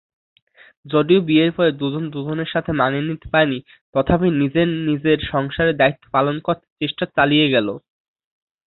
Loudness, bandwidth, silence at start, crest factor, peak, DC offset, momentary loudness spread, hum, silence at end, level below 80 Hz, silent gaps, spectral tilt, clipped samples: -19 LUFS; 4.3 kHz; 0.85 s; 18 dB; -2 dBFS; under 0.1%; 9 LU; none; 0.9 s; -46 dBFS; 3.81-3.93 s, 6.70-6.76 s; -11 dB/octave; under 0.1%